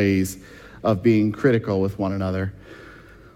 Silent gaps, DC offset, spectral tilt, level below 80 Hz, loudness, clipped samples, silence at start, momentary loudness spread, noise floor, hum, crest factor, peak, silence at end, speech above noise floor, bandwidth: none; under 0.1%; -7 dB/octave; -52 dBFS; -22 LUFS; under 0.1%; 0 s; 24 LU; -45 dBFS; none; 16 dB; -6 dBFS; 0.35 s; 24 dB; 16.5 kHz